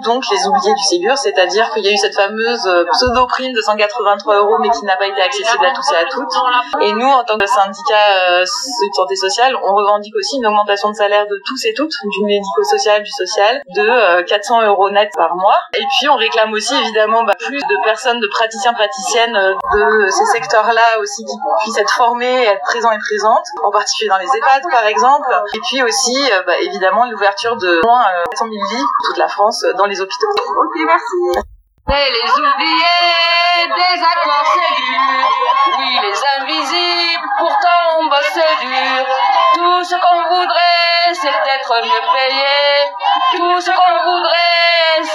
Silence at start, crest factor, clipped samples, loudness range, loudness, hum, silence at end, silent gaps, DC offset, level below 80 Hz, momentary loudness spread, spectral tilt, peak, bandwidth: 0 s; 14 dB; under 0.1%; 2 LU; -13 LUFS; none; 0 s; none; under 0.1%; -46 dBFS; 5 LU; -1.5 dB/octave; 0 dBFS; 13 kHz